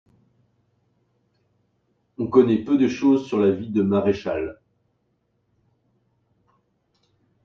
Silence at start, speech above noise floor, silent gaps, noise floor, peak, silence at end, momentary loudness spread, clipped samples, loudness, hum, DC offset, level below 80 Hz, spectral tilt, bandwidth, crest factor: 2.2 s; 50 dB; none; -70 dBFS; -4 dBFS; 2.9 s; 11 LU; under 0.1%; -21 LUFS; none; under 0.1%; -60 dBFS; -8 dB/octave; 7 kHz; 22 dB